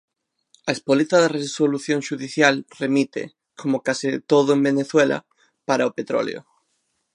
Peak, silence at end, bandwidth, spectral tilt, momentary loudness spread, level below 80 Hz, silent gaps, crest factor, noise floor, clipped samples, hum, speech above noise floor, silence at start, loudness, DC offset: 0 dBFS; 0.75 s; 11 kHz; -4.5 dB/octave; 12 LU; -74 dBFS; none; 20 dB; -72 dBFS; under 0.1%; none; 51 dB; 0.65 s; -21 LUFS; under 0.1%